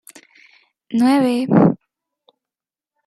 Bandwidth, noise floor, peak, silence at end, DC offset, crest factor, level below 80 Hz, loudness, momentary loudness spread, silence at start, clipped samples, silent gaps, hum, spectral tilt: 13 kHz; -90 dBFS; -2 dBFS; 1.3 s; under 0.1%; 18 dB; -60 dBFS; -16 LUFS; 9 LU; 0.9 s; under 0.1%; none; none; -7.5 dB/octave